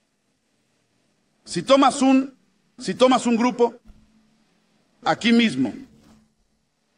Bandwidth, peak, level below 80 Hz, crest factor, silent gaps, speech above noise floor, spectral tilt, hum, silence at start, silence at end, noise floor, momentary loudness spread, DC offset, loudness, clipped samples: 10.5 kHz; -4 dBFS; -62 dBFS; 20 dB; none; 51 dB; -4.5 dB/octave; none; 1.45 s; 1.15 s; -70 dBFS; 14 LU; under 0.1%; -20 LUFS; under 0.1%